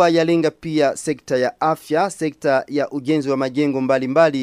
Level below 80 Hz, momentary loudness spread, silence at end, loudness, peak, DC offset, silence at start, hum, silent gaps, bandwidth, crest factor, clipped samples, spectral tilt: -60 dBFS; 6 LU; 0 s; -19 LUFS; -2 dBFS; under 0.1%; 0 s; none; none; 15.5 kHz; 16 dB; under 0.1%; -5.5 dB/octave